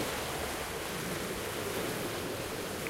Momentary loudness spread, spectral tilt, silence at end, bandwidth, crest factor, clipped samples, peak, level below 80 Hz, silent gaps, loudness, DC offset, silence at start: 2 LU; -3.5 dB/octave; 0 s; 16 kHz; 14 dB; under 0.1%; -22 dBFS; -54 dBFS; none; -36 LUFS; under 0.1%; 0 s